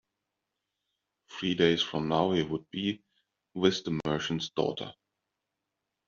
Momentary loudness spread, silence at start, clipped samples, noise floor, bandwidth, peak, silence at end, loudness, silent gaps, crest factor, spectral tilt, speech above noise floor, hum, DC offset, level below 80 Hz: 15 LU; 1.3 s; under 0.1%; -85 dBFS; 7.4 kHz; -10 dBFS; 1.15 s; -30 LUFS; none; 22 dB; -4 dB/octave; 56 dB; none; under 0.1%; -64 dBFS